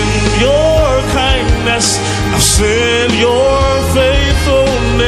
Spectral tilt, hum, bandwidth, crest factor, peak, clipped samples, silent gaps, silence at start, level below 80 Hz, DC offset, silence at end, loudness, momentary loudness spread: -4 dB/octave; none; 14.5 kHz; 10 dB; 0 dBFS; under 0.1%; none; 0 s; -18 dBFS; under 0.1%; 0 s; -11 LUFS; 3 LU